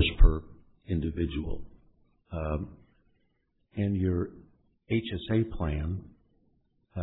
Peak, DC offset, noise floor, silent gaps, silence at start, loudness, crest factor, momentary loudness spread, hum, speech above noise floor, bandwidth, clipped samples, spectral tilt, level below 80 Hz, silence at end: -6 dBFS; under 0.1%; -74 dBFS; none; 0 s; -31 LUFS; 22 dB; 14 LU; none; 43 dB; 4 kHz; under 0.1%; -10.5 dB/octave; -32 dBFS; 0 s